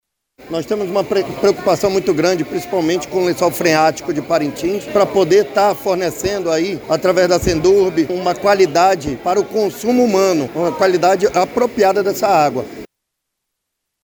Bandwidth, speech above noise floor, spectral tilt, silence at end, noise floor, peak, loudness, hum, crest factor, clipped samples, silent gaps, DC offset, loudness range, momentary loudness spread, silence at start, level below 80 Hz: over 20 kHz; 62 dB; -5 dB/octave; 1.2 s; -77 dBFS; -2 dBFS; -16 LUFS; none; 14 dB; under 0.1%; none; under 0.1%; 2 LU; 7 LU; 0.4 s; -44 dBFS